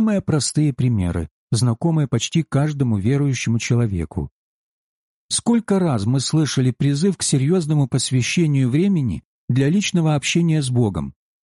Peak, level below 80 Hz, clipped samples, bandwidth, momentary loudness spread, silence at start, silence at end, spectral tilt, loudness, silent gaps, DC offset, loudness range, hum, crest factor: -8 dBFS; -44 dBFS; under 0.1%; 11.5 kHz; 6 LU; 0 s; 0.3 s; -5.5 dB/octave; -19 LUFS; 1.31-1.48 s, 4.31-5.29 s, 9.25-9.48 s; under 0.1%; 3 LU; none; 12 dB